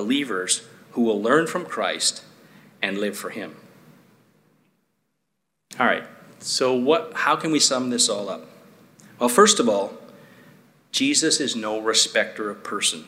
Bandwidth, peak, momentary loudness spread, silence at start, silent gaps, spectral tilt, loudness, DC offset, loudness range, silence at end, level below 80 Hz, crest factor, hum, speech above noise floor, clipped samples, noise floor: 16 kHz; -2 dBFS; 14 LU; 0 s; none; -2 dB/octave; -21 LUFS; under 0.1%; 10 LU; 0.05 s; -78 dBFS; 22 dB; none; 56 dB; under 0.1%; -78 dBFS